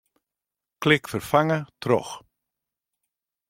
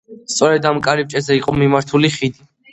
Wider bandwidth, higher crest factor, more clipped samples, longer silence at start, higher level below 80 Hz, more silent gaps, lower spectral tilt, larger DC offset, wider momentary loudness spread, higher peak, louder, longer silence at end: first, 16.5 kHz vs 8.8 kHz; first, 22 dB vs 16 dB; neither; first, 0.8 s vs 0.1 s; second, -62 dBFS vs -48 dBFS; neither; about the same, -5.5 dB/octave vs -5 dB/octave; neither; first, 11 LU vs 7 LU; second, -4 dBFS vs 0 dBFS; second, -23 LUFS vs -16 LUFS; first, 1.3 s vs 0.4 s